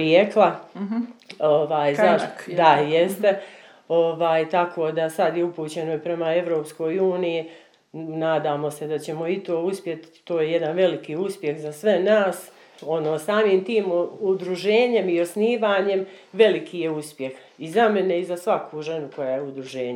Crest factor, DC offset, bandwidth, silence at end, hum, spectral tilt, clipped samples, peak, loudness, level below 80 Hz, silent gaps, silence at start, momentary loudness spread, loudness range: 20 dB; under 0.1%; 16.5 kHz; 0 s; none; -5.5 dB/octave; under 0.1%; -2 dBFS; -22 LUFS; -82 dBFS; none; 0 s; 11 LU; 5 LU